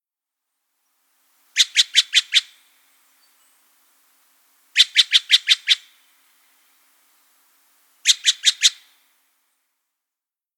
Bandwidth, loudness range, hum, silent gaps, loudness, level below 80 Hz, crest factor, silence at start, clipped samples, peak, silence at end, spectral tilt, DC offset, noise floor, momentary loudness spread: over 20 kHz; 3 LU; none; none; -16 LUFS; under -90 dBFS; 24 dB; 1.55 s; under 0.1%; 0 dBFS; 1.85 s; 9.5 dB/octave; under 0.1%; -89 dBFS; 6 LU